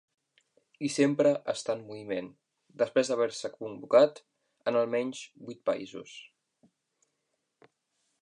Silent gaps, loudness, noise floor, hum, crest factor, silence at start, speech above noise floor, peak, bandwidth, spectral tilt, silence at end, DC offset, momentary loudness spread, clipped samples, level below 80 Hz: none; -29 LUFS; -81 dBFS; none; 22 dB; 0.8 s; 52 dB; -10 dBFS; 11 kHz; -5 dB/octave; 1.95 s; under 0.1%; 19 LU; under 0.1%; -82 dBFS